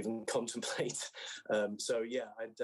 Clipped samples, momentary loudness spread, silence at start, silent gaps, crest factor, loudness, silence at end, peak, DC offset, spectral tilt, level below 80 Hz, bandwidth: under 0.1%; 7 LU; 0 s; none; 16 dB; -37 LUFS; 0 s; -22 dBFS; under 0.1%; -3 dB/octave; -88 dBFS; 12.5 kHz